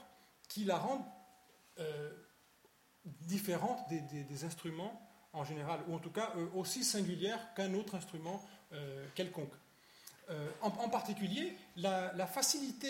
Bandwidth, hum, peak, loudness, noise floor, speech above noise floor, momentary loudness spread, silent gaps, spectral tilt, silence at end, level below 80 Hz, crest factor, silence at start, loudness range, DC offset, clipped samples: 16.5 kHz; none; -18 dBFS; -40 LUFS; -69 dBFS; 29 dB; 16 LU; none; -4 dB/octave; 0 s; -82 dBFS; 22 dB; 0 s; 5 LU; under 0.1%; under 0.1%